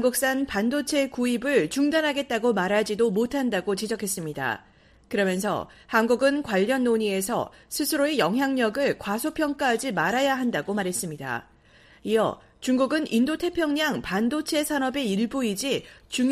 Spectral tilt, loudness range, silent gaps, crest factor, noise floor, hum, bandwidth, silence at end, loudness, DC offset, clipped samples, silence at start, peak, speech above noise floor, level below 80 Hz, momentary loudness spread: -4 dB/octave; 3 LU; none; 18 dB; -55 dBFS; none; 15.5 kHz; 0 s; -25 LUFS; under 0.1%; under 0.1%; 0 s; -8 dBFS; 30 dB; -58 dBFS; 7 LU